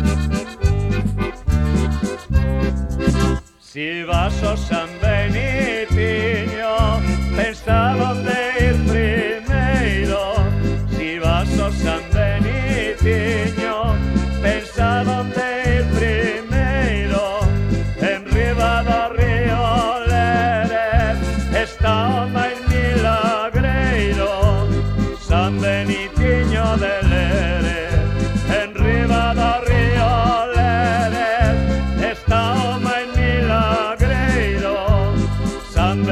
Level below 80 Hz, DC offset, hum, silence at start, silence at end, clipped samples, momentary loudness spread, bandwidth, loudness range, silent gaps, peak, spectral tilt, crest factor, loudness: -24 dBFS; under 0.1%; none; 0 s; 0 s; under 0.1%; 4 LU; 13 kHz; 3 LU; none; -2 dBFS; -6.5 dB/octave; 16 dB; -18 LUFS